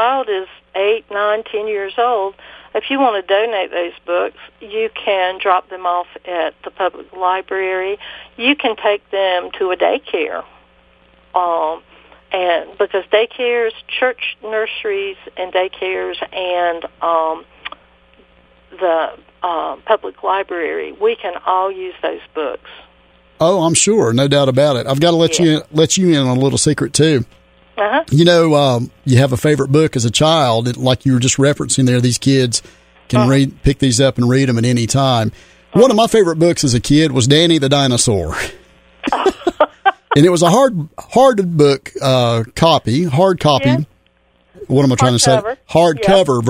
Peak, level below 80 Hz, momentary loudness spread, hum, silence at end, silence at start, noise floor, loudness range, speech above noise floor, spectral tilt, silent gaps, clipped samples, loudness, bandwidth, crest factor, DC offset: 0 dBFS; -42 dBFS; 11 LU; none; 0 s; 0 s; -56 dBFS; 7 LU; 41 dB; -5 dB/octave; none; under 0.1%; -15 LUFS; 16 kHz; 16 dB; under 0.1%